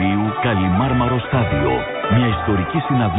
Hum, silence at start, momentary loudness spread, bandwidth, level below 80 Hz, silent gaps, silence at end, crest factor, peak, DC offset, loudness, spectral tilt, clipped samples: none; 0 s; 3 LU; 4 kHz; -32 dBFS; none; 0 s; 12 dB; -6 dBFS; under 0.1%; -18 LUFS; -12.5 dB/octave; under 0.1%